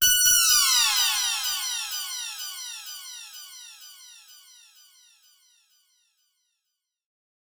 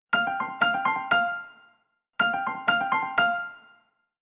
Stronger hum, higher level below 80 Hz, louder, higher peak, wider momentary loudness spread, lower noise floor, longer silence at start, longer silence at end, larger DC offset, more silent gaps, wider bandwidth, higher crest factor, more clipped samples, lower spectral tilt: neither; first, -58 dBFS vs -72 dBFS; first, -21 LUFS vs -25 LUFS; about the same, -8 dBFS vs -8 dBFS; first, 25 LU vs 12 LU; first, -83 dBFS vs -68 dBFS; about the same, 0 s vs 0.1 s; first, 3.45 s vs 0.65 s; neither; neither; first, over 20 kHz vs 4 kHz; about the same, 20 dB vs 18 dB; neither; second, 4.5 dB/octave vs -0.5 dB/octave